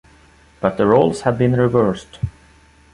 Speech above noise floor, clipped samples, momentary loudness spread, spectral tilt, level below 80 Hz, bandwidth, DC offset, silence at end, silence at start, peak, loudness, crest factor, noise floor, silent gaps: 33 dB; under 0.1%; 14 LU; -7.5 dB/octave; -44 dBFS; 11.5 kHz; under 0.1%; 0.65 s; 0.6 s; -2 dBFS; -17 LUFS; 18 dB; -49 dBFS; none